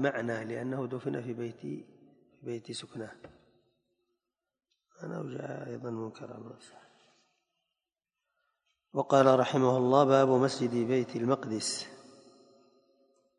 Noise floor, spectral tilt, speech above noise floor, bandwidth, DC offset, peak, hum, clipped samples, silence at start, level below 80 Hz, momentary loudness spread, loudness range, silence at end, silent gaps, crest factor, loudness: under -90 dBFS; -5.5 dB/octave; over 60 dB; 11 kHz; under 0.1%; -8 dBFS; none; under 0.1%; 0 s; -76 dBFS; 21 LU; 18 LU; 1.35 s; none; 24 dB; -30 LUFS